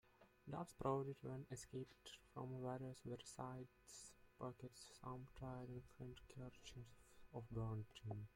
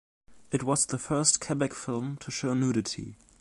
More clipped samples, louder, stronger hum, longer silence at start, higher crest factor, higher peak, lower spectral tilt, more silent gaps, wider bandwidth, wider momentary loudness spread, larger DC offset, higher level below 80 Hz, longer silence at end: neither; second, -53 LUFS vs -28 LUFS; neither; second, 0.05 s vs 0.3 s; about the same, 22 dB vs 24 dB; second, -30 dBFS vs -6 dBFS; first, -6 dB/octave vs -4 dB/octave; neither; first, 16.5 kHz vs 11.5 kHz; about the same, 12 LU vs 11 LU; neither; second, -72 dBFS vs -60 dBFS; second, 0 s vs 0.25 s